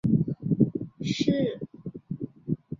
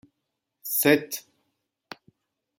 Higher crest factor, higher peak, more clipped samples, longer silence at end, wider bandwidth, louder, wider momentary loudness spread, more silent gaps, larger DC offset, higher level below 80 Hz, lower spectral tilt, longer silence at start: about the same, 20 dB vs 24 dB; about the same, -8 dBFS vs -6 dBFS; neither; second, 0.05 s vs 1.4 s; second, 7.6 kHz vs 17 kHz; second, -28 LUFS vs -24 LUFS; second, 13 LU vs 25 LU; neither; neither; first, -56 dBFS vs -74 dBFS; first, -7.5 dB/octave vs -3.5 dB/octave; second, 0.05 s vs 0.65 s